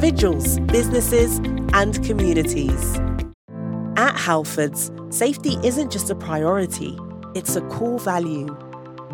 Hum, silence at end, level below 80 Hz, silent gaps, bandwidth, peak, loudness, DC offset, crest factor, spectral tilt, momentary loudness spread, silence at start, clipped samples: none; 0 s; -30 dBFS; 3.34-3.48 s; 18 kHz; -2 dBFS; -21 LUFS; under 0.1%; 18 dB; -5 dB/octave; 12 LU; 0 s; under 0.1%